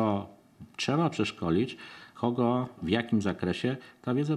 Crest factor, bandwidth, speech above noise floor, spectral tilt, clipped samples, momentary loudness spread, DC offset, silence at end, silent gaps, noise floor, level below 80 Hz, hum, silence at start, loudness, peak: 20 dB; 11.5 kHz; 23 dB; -6.5 dB/octave; under 0.1%; 11 LU; under 0.1%; 0 s; none; -52 dBFS; -64 dBFS; none; 0 s; -30 LUFS; -10 dBFS